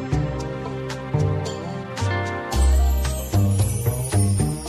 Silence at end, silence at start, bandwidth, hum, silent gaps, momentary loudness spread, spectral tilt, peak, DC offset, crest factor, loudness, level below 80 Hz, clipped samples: 0 s; 0 s; 13.5 kHz; none; none; 9 LU; -5.5 dB/octave; -8 dBFS; under 0.1%; 14 dB; -23 LUFS; -26 dBFS; under 0.1%